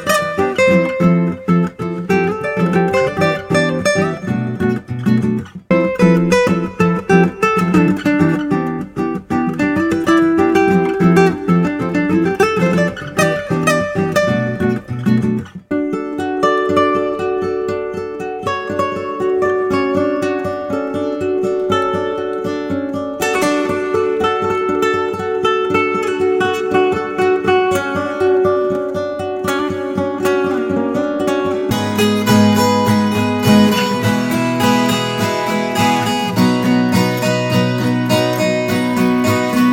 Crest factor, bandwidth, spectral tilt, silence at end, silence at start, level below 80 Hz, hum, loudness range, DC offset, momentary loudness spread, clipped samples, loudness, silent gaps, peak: 16 dB; 17.5 kHz; -6 dB/octave; 0 s; 0 s; -48 dBFS; none; 4 LU; under 0.1%; 7 LU; under 0.1%; -16 LUFS; none; 0 dBFS